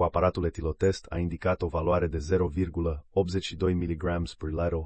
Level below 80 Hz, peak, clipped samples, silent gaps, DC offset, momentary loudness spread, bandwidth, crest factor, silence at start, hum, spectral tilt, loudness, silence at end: -42 dBFS; -10 dBFS; under 0.1%; none; under 0.1%; 5 LU; 8.8 kHz; 18 dB; 0 s; none; -7 dB/octave; -29 LUFS; 0 s